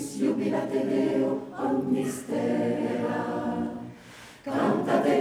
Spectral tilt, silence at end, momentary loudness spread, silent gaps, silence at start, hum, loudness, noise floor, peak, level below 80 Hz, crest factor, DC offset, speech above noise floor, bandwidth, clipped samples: -6 dB/octave; 0 s; 11 LU; none; 0 s; none; -27 LUFS; -48 dBFS; -10 dBFS; -66 dBFS; 16 dB; under 0.1%; 22 dB; 14.5 kHz; under 0.1%